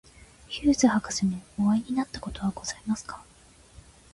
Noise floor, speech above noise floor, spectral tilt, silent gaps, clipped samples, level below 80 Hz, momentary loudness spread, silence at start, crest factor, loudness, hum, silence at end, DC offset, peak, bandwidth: -55 dBFS; 28 dB; -4.5 dB/octave; none; under 0.1%; -50 dBFS; 12 LU; 0.5 s; 20 dB; -27 LUFS; none; 0.35 s; under 0.1%; -8 dBFS; 11.5 kHz